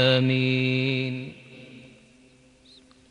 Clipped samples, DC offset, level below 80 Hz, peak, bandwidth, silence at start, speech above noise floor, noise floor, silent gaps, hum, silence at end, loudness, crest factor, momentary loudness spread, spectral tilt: under 0.1%; under 0.1%; -68 dBFS; -8 dBFS; 9 kHz; 0 s; 33 dB; -56 dBFS; none; none; 1.3 s; -24 LUFS; 18 dB; 25 LU; -7 dB/octave